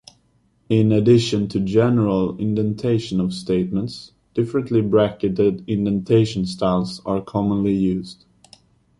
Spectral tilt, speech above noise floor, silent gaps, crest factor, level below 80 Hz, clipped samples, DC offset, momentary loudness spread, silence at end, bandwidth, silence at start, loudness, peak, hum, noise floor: -7.5 dB/octave; 42 dB; none; 16 dB; -48 dBFS; under 0.1%; under 0.1%; 8 LU; 0.85 s; 11.5 kHz; 0.7 s; -20 LUFS; -4 dBFS; none; -61 dBFS